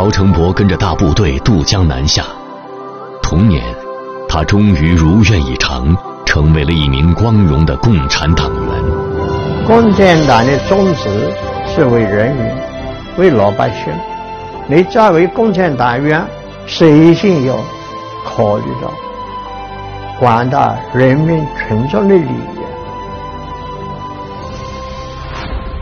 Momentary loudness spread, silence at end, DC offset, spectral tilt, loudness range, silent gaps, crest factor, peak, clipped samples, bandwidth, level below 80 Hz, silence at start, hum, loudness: 16 LU; 0 s; under 0.1%; -6.5 dB/octave; 5 LU; none; 12 dB; 0 dBFS; 0.3%; 7 kHz; -24 dBFS; 0 s; none; -12 LUFS